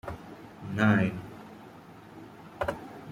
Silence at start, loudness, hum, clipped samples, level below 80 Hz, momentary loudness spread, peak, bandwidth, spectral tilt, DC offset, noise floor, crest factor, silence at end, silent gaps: 0.05 s; -29 LUFS; none; under 0.1%; -58 dBFS; 24 LU; -10 dBFS; 15.5 kHz; -7.5 dB/octave; under 0.1%; -49 dBFS; 22 dB; 0 s; none